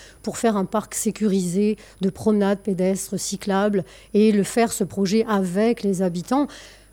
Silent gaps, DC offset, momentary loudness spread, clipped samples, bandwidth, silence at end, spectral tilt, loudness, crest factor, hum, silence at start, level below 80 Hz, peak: none; under 0.1%; 7 LU; under 0.1%; 17 kHz; 0.25 s; -5.5 dB/octave; -22 LUFS; 14 dB; none; 0 s; -54 dBFS; -6 dBFS